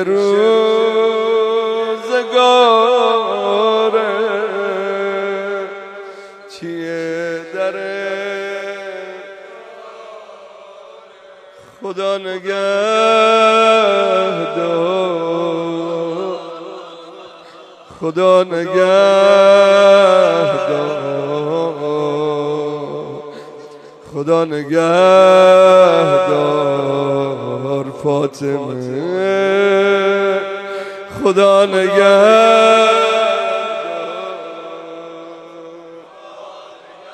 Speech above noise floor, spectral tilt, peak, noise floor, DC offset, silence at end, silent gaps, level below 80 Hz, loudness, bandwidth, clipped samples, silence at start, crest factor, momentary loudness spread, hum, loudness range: 30 dB; -5 dB/octave; 0 dBFS; -41 dBFS; under 0.1%; 0 s; none; -66 dBFS; -14 LUFS; 9.4 kHz; under 0.1%; 0 s; 14 dB; 22 LU; none; 13 LU